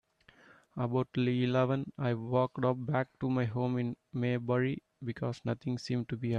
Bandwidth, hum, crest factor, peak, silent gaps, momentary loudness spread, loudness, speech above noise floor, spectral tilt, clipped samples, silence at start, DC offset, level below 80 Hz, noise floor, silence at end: 7.8 kHz; none; 16 dB; -16 dBFS; none; 7 LU; -33 LUFS; 30 dB; -8 dB/octave; under 0.1%; 0.75 s; under 0.1%; -68 dBFS; -62 dBFS; 0 s